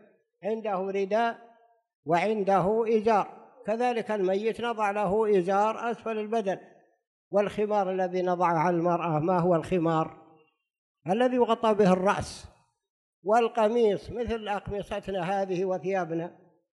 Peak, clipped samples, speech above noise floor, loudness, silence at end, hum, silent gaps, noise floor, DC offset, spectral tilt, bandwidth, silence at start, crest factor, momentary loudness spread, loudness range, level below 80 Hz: -10 dBFS; under 0.1%; 34 dB; -27 LUFS; 0.5 s; none; 1.95-2.03 s, 7.07-7.31 s, 10.78-10.95 s, 12.90-13.22 s; -60 dBFS; under 0.1%; -6.5 dB/octave; 11.5 kHz; 0.45 s; 16 dB; 10 LU; 2 LU; -58 dBFS